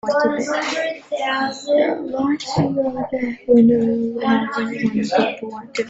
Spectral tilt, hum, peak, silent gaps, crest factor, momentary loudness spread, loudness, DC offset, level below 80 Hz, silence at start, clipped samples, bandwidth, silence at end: -5.5 dB/octave; none; -4 dBFS; none; 16 dB; 9 LU; -19 LUFS; under 0.1%; -56 dBFS; 0.05 s; under 0.1%; 8 kHz; 0 s